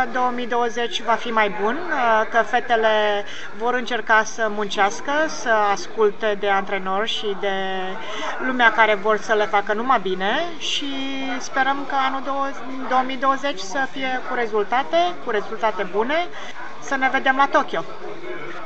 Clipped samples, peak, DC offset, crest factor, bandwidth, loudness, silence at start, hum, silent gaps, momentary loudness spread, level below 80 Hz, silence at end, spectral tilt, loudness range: under 0.1%; -2 dBFS; 4%; 20 dB; 8.2 kHz; -21 LUFS; 0 s; none; none; 9 LU; -66 dBFS; 0 s; -3 dB/octave; 3 LU